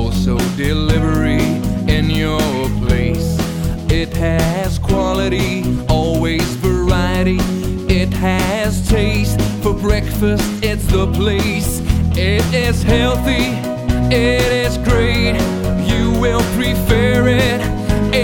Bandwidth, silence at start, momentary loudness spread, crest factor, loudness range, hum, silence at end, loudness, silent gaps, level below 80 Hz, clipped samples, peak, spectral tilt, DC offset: 19.5 kHz; 0 s; 4 LU; 12 dB; 2 LU; none; 0 s; -16 LUFS; none; -22 dBFS; under 0.1%; -2 dBFS; -6 dB/octave; 0.3%